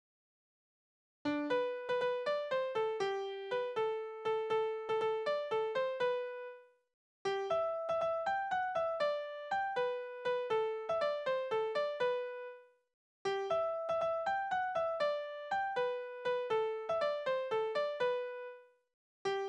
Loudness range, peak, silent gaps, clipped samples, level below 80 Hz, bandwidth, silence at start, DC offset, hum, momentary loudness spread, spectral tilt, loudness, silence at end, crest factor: 1 LU; -24 dBFS; 6.94-7.25 s, 12.94-13.25 s, 18.94-19.25 s; under 0.1%; -78 dBFS; 9.8 kHz; 1.25 s; under 0.1%; none; 5 LU; -4 dB/octave; -36 LUFS; 0 s; 14 dB